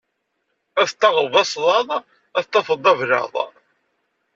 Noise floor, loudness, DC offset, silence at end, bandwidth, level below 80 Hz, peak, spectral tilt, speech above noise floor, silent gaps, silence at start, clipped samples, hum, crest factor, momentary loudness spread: -73 dBFS; -19 LUFS; under 0.1%; 0.85 s; 8 kHz; -70 dBFS; -2 dBFS; -2.5 dB/octave; 55 dB; none; 0.75 s; under 0.1%; none; 18 dB; 10 LU